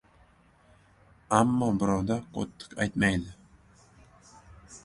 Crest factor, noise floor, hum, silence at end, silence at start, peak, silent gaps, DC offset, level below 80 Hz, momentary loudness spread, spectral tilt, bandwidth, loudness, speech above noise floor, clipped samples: 26 dB; -60 dBFS; none; 0.05 s; 1.3 s; -6 dBFS; none; under 0.1%; -52 dBFS; 13 LU; -6 dB/octave; 11.5 kHz; -28 LUFS; 33 dB; under 0.1%